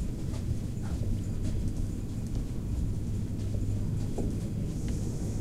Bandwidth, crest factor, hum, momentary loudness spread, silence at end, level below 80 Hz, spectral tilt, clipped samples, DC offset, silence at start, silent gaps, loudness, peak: 14.5 kHz; 12 dB; none; 3 LU; 0 s; -36 dBFS; -7.5 dB/octave; under 0.1%; 0.5%; 0 s; none; -34 LUFS; -18 dBFS